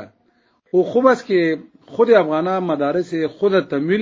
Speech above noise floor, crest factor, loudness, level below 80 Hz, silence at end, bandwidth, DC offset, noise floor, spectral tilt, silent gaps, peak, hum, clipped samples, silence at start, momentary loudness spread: 44 dB; 18 dB; -18 LUFS; -66 dBFS; 0 s; 7.6 kHz; under 0.1%; -61 dBFS; -7 dB/octave; none; 0 dBFS; none; under 0.1%; 0 s; 7 LU